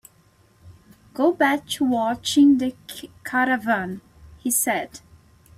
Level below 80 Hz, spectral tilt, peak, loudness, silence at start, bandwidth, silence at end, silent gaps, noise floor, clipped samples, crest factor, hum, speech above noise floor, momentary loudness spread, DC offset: -58 dBFS; -3 dB/octave; -6 dBFS; -21 LUFS; 0.65 s; 16 kHz; 0.6 s; none; -57 dBFS; under 0.1%; 16 dB; none; 36 dB; 20 LU; under 0.1%